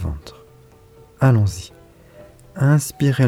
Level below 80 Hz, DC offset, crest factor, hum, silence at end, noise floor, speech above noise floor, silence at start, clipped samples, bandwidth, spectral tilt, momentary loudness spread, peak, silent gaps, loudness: -40 dBFS; under 0.1%; 16 dB; none; 0 s; -48 dBFS; 32 dB; 0 s; under 0.1%; 15.5 kHz; -6.5 dB/octave; 23 LU; -4 dBFS; none; -18 LUFS